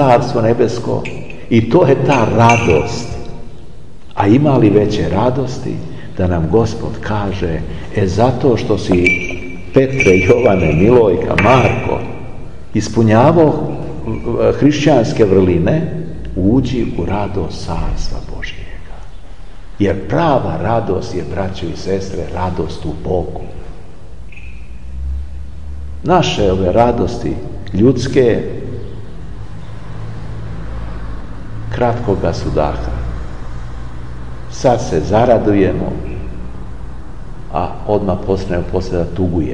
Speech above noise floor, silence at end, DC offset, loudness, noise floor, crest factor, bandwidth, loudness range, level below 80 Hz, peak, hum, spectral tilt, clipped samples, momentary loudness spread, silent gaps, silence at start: 23 dB; 0 s; 5%; -14 LUFS; -36 dBFS; 16 dB; 10.5 kHz; 10 LU; -30 dBFS; 0 dBFS; none; -7 dB/octave; under 0.1%; 20 LU; none; 0 s